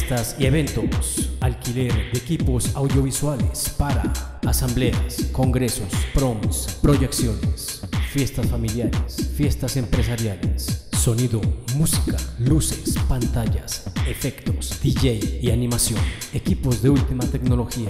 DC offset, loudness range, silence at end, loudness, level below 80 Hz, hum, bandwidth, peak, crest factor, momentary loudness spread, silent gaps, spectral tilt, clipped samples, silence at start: under 0.1%; 1 LU; 0 s; -22 LUFS; -28 dBFS; none; 16 kHz; -6 dBFS; 16 dB; 6 LU; none; -5.5 dB/octave; under 0.1%; 0 s